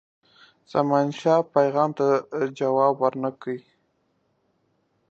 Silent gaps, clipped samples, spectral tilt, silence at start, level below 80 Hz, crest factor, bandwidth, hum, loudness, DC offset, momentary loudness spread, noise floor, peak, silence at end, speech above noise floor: none; under 0.1%; -7 dB/octave; 0.75 s; -76 dBFS; 20 dB; 7.8 kHz; none; -23 LUFS; under 0.1%; 9 LU; -70 dBFS; -4 dBFS; 1.5 s; 47 dB